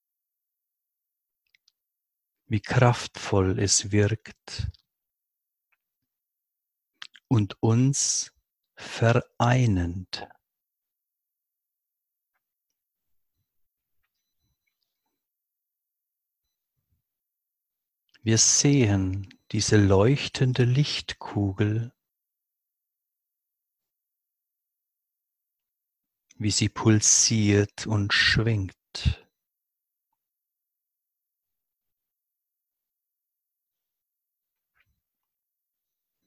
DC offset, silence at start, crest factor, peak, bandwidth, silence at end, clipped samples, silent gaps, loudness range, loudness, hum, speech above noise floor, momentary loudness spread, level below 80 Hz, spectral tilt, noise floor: under 0.1%; 2.5 s; 26 dB; -2 dBFS; 12 kHz; 7.1 s; under 0.1%; none; 12 LU; -23 LUFS; none; 62 dB; 16 LU; -46 dBFS; -4 dB/octave; -85 dBFS